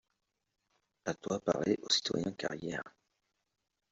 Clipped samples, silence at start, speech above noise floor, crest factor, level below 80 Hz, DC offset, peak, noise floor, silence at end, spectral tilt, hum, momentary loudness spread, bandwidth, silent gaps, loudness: under 0.1%; 1.05 s; 49 dB; 22 dB; -70 dBFS; under 0.1%; -16 dBFS; -84 dBFS; 1 s; -3 dB/octave; none; 12 LU; 8 kHz; none; -35 LUFS